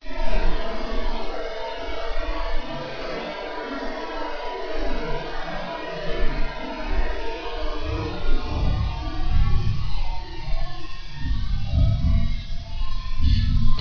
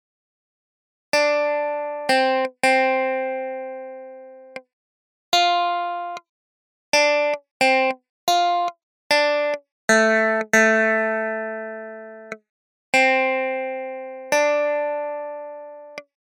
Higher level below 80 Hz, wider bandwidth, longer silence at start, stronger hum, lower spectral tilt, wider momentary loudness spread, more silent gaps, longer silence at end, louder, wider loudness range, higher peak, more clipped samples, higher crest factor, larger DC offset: first, -24 dBFS vs -80 dBFS; second, 5.4 kHz vs 17 kHz; second, 0.05 s vs 1.15 s; neither; first, -7 dB/octave vs -2 dB/octave; second, 10 LU vs 21 LU; second, none vs 4.73-5.32 s, 6.29-6.92 s, 7.51-7.60 s, 8.09-8.27 s, 8.83-9.10 s, 9.72-9.88 s, 12.49-12.93 s; second, 0 s vs 0.35 s; second, -28 LUFS vs -20 LUFS; about the same, 4 LU vs 5 LU; second, -6 dBFS vs 0 dBFS; neither; second, 14 dB vs 22 dB; neither